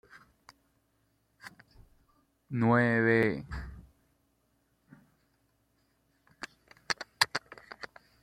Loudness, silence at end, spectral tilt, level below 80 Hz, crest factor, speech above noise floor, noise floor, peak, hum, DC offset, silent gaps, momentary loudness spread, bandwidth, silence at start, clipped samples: -29 LUFS; 0.4 s; -5 dB/octave; -56 dBFS; 28 dB; 47 dB; -74 dBFS; -6 dBFS; none; under 0.1%; none; 25 LU; 16 kHz; 1.45 s; under 0.1%